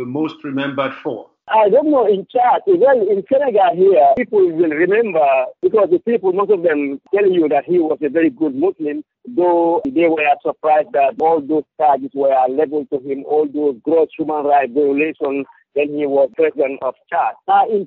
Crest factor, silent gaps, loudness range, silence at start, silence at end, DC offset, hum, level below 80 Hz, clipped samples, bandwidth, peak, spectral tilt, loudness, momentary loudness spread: 12 dB; none; 4 LU; 0 s; 0 s; under 0.1%; none; -64 dBFS; under 0.1%; 4.2 kHz; -2 dBFS; -4.5 dB/octave; -16 LUFS; 9 LU